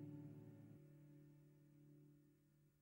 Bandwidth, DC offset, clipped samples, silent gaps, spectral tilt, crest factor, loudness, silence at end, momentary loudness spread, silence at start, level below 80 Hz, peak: 16 kHz; under 0.1%; under 0.1%; none; -9 dB/octave; 16 dB; -64 LUFS; 0 s; 11 LU; 0 s; -90 dBFS; -46 dBFS